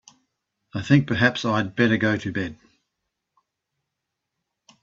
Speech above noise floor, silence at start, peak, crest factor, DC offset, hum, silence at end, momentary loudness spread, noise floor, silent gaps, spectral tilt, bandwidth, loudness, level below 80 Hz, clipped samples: 61 dB; 0.75 s; -2 dBFS; 22 dB; under 0.1%; none; 2.3 s; 14 LU; -82 dBFS; none; -6.5 dB/octave; 7.8 kHz; -21 LUFS; -60 dBFS; under 0.1%